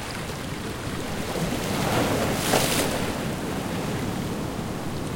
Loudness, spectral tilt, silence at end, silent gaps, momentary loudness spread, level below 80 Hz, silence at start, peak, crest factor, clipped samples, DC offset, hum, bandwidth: -27 LUFS; -4 dB/octave; 0 s; none; 9 LU; -42 dBFS; 0 s; -6 dBFS; 20 dB; under 0.1%; under 0.1%; none; 16.5 kHz